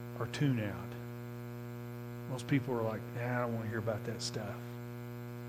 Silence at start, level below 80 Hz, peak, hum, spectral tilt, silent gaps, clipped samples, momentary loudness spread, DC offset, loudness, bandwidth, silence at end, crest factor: 0 s; -66 dBFS; -18 dBFS; 60 Hz at -45 dBFS; -6 dB/octave; none; under 0.1%; 11 LU; under 0.1%; -38 LUFS; 16 kHz; 0 s; 20 dB